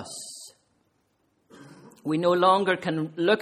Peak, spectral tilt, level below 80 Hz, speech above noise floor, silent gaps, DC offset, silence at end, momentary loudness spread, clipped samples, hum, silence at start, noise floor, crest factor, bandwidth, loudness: -6 dBFS; -5 dB/octave; -72 dBFS; 47 dB; none; under 0.1%; 0 s; 18 LU; under 0.1%; none; 0 s; -70 dBFS; 20 dB; 14 kHz; -24 LUFS